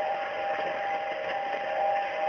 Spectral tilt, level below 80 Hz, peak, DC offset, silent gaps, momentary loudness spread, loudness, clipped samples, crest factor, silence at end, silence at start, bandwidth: 0 dB/octave; -72 dBFS; -18 dBFS; under 0.1%; none; 3 LU; -30 LUFS; under 0.1%; 12 dB; 0 s; 0 s; 6.6 kHz